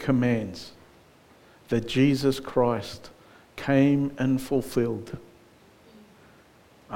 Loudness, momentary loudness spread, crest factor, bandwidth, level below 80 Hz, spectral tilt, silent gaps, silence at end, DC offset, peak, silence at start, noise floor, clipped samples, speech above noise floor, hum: -25 LUFS; 20 LU; 18 dB; 17 kHz; -54 dBFS; -7 dB/octave; none; 0 s; under 0.1%; -8 dBFS; 0 s; -56 dBFS; under 0.1%; 31 dB; none